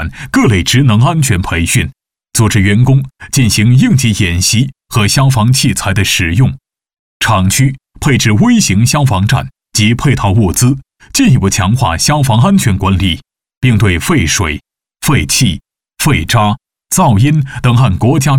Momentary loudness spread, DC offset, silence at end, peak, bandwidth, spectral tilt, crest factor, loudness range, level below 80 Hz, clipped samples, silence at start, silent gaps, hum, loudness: 7 LU; under 0.1%; 0 s; 0 dBFS; 17.5 kHz; -4.5 dB/octave; 10 dB; 2 LU; -32 dBFS; under 0.1%; 0 s; 6.99-7.20 s, 13.57-13.61 s; none; -11 LUFS